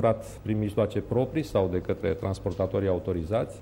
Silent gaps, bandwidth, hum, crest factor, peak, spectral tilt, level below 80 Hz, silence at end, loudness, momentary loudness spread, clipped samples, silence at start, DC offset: none; 16 kHz; none; 16 dB; -12 dBFS; -8 dB/octave; -46 dBFS; 0 s; -28 LUFS; 3 LU; under 0.1%; 0 s; under 0.1%